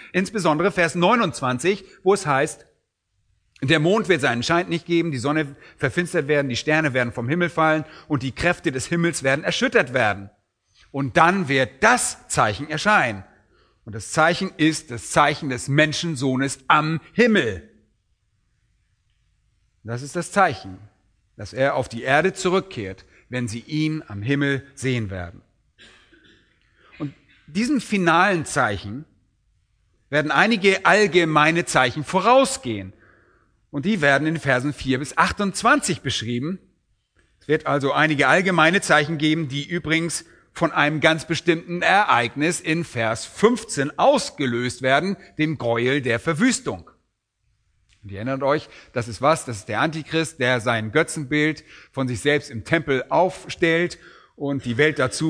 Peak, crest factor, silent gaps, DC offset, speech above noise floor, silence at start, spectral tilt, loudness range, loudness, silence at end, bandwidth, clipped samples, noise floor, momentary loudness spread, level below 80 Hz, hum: 0 dBFS; 22 dB; none; under 0.1%; 51 dB; 0 s; -4.5 dB/octave; 7 LU; -21 LUFS; 0 s; 11 kHz; under 0.1%; -72 dBFS; 13 LU; -54 dBFS; none